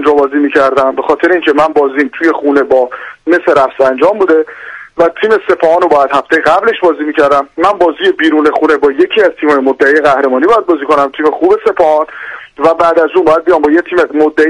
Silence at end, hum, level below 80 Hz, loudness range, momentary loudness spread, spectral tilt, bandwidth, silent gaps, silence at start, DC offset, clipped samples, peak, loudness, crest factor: 0 s; none; -48 dBFS; 1 LU; 4 LU; -5 dB/octave; 11 kHz; none; 0 s; under 0.1%; 0.2%; 0 dBFS; -9 LUFS; 10 dB